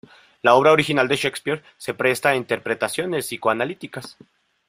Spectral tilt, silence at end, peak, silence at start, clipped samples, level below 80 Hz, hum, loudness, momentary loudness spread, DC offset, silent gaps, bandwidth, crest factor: -4 dB/octave; 0.55 s; -2 dBFS; 0.45 s; under 0.1%; -62 dBFS; none; -20 LUFS; 16 LU; under 0.1%; none; 16 kHz; 20 dB